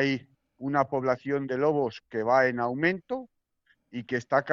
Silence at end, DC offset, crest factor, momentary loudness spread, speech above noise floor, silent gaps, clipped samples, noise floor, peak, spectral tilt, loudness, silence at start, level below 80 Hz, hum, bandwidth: 0 s; under 0.1%; 20 dB; 13 LU; 43 dB; none; under 0.1%; -70 dBFS; -8 dBFS; -4.5 dB/octave; -28 LUFS; 0 s; -68 dBFS; none; 7.4 kHz